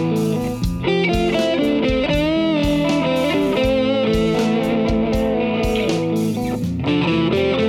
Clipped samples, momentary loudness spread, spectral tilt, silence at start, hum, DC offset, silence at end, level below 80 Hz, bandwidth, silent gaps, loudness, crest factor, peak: under 0.1%; 3 LU; -6.5 dB/octave; 0 s; none; under 0.1%; 0 s; -32 dBFS; 16.5 kHz; none; -18 LUFS; 12 dB; -6 dBFS